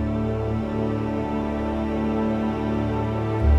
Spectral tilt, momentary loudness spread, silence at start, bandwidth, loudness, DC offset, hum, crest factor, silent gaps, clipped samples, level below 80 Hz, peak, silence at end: -9 dB/octave; 2 LU; 0 s; 7.4 kHz; -25 LUFS; under 0.1%; none; 16 dB; none; under 0.1%; -30 dBFS; -8 dBFS; 0 s